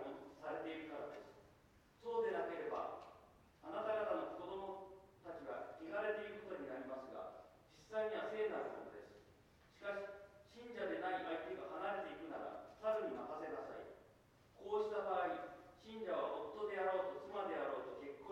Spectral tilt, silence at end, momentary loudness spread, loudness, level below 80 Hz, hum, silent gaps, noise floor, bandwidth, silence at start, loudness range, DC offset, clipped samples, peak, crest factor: -5.5 dB/octave; 0 s; 18 LU; -45 LUFS; -78 dBFS; none; none; -69 dBFS; 15 kHz; 0 s; 4 LU; under 0.1%; under 0.1%; -28 dBFS; 18 dB